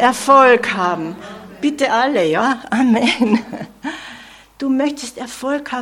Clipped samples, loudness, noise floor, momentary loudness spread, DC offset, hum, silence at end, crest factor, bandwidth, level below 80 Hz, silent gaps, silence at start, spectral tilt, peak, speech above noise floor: under 0.1%; -16 LUFS; -40 dBFS; 17 LU; under 0.1%; none; 0 s; 16 dB; 15.5 kHz; -56 dBFS; none; 0 s; -4 dB/octave; 0 dBFS; 24 dB